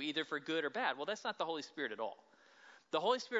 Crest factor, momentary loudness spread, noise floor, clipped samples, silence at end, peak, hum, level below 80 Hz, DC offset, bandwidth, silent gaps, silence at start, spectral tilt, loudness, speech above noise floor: 20 dB; 8 LU; -63 dBFS; under 0.1%; 0 s; -20 dBFS; none; under -90 dBFS; under 0.1%; 7.6 kHz; none; 0 s; -0.5 dB/octave; -39 LUFS; 24 dB